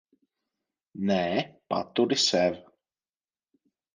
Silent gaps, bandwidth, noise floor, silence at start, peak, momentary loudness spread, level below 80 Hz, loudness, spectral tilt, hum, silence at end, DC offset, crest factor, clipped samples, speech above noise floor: none; 10 kHz; under -90 dBFS; 0.95 s; -10 dBFS; 10 LU; -66 dBFS; -26 LUFS; -4 dB/octave; none; 1.35 s; under 0.1%; 20 dB; under 0.1%; over 64 dB